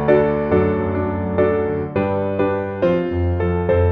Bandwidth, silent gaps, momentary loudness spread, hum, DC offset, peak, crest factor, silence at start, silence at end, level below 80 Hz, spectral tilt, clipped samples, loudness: 5 kHz; none; 4 LU; none; under 0.1%; -2 dBFS; 16 dB; 0 s; 0 s; -36 dBFS; -10.5 dB/octave; under 0.1%; -19 LUFS